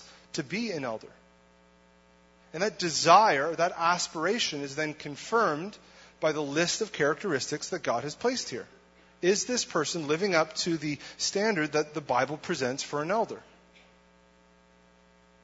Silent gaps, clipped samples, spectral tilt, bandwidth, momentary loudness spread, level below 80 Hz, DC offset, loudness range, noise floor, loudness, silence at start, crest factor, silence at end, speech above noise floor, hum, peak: none; under 0.1%; -3 dB/octave; 8 kHz; 9 LU; -68 dBFS; under 0.1%; 5 LU; -60 dBFS; -28 LUFS; 0 s; 22 dB; 2.05 s; 32 dB; none; -8 dBFS